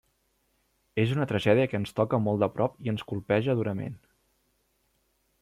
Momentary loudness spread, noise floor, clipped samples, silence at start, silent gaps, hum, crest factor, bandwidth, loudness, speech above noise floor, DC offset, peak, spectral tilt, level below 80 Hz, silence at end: 10 LU; -72 dBFS; under 0.1%; 0.95 s; none; none; 20 dB; 13 kHz; -28 LUFS; 45 dB; under 0.1%; -8 dBFS; -7.5 dB/octave; -62 dBFS; 1.45 s